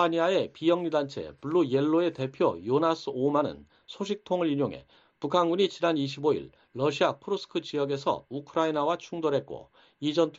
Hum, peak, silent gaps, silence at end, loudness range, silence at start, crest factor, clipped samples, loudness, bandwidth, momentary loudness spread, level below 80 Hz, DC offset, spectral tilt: none; -10 dBFS; none; 0 s; 2 LU; 0 s; 18 dB; under 0.1%; -28 LUFS; 7.8 kHz; 9 LU; -68 dBFS; under 0.1%; -6 dB/octave